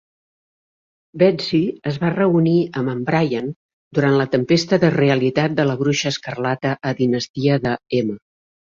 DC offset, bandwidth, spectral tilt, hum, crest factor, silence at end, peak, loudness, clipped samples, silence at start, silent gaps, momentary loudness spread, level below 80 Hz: under 0.1%; 7.6 kHz; -6.5 dB/octave; none; 18 dB; 0.5 s; -2 dBFS; -19 LUFS; under 0.1%; 1.15 s; 3.56-3.91 s, 7.29-7.34 s; 7 LU; -56 dBFS